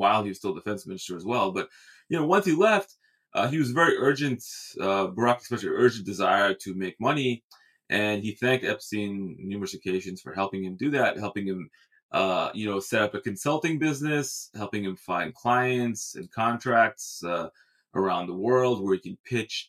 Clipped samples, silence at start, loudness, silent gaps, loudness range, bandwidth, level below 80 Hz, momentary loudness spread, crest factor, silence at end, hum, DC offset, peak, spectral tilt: under 0.1%; 0 s; -27 LUFS; 7.44-7.50 s, 12.03-12.09 s, 19.20-19.24 s; 4 LU; 15.5 kHz; -72 dBFS; 12 LU; 20 dB; 0.05 s; none; under 0.1%; -6 dBFS; -5 dB/octave